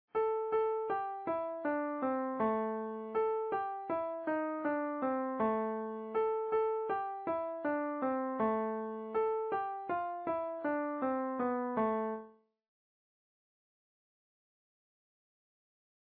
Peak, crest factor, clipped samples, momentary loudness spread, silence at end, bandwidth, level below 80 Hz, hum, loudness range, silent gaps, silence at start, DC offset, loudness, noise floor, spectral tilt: -22 dBFS; 14 dB; under 0.1%; 4 LU; 3.9 s; 4.4 kHz; -76 dBFS; none; 3 LU; none; 0.15 s; under 0.1%; -35 LUFS; -55 dBFS; -5.5 dB/octave